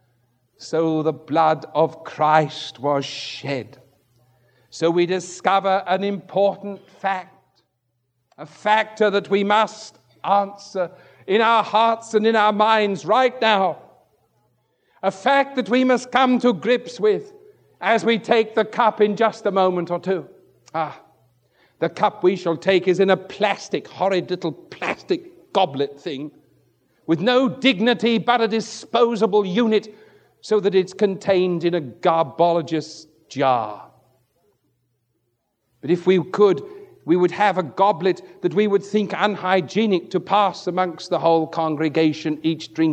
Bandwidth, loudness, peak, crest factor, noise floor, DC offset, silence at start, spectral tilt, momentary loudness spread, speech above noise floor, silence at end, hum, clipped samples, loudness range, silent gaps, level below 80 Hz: 9.4 kHz; -20 LUFS; -2 dBFS; 20 dB; -72 dBFS; under 0.1%; 0.6 s; -5.5 dB/octave; 10 LU; 52 dB; 0 s; none; under 0.1%; 5 LU; none; -74 dBFS